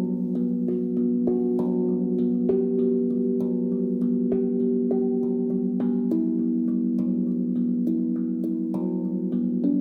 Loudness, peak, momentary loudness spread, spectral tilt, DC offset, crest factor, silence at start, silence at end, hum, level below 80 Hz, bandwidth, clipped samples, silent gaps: -24 LUFS; -12 dBFS; 3 LU; -12.5 dB/octave; under 0.1%; 12 dB; 0 s; 0 s; none; -66 dBFS; 1.7 kHz; under 0.1%; none